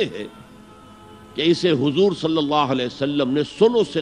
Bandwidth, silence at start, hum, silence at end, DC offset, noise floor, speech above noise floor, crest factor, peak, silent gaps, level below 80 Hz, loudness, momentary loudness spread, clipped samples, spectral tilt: 11 kHz; 0 s; none; 0 s; under 0.1%; -44 dBFS; 25 dB; 18 dB; -2 dBFS; none; -56 dBFS; -20 LUFS; 9 LU; under 0.1%; -6 dB/octave